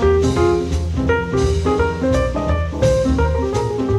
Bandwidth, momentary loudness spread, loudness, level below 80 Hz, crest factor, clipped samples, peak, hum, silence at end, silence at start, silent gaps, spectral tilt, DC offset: 11.5 kHz; 4 LU; -18 LUFS; -24 dBFS; 14 dB; under 0.1%; -4 dBFS; none; 0 s; 0 s; none; -7 dB/octave; under 0.1%